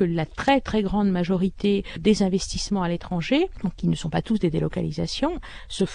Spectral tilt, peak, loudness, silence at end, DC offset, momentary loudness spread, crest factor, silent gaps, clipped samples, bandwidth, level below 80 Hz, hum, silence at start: -6 dB/octave; -6 dBFS; -24 LUFS; 0 s; under 0.1%; 6 LU; 18 dB; none; under 0.1%; 10.5 kHz; -40 dBFS; none; 0 s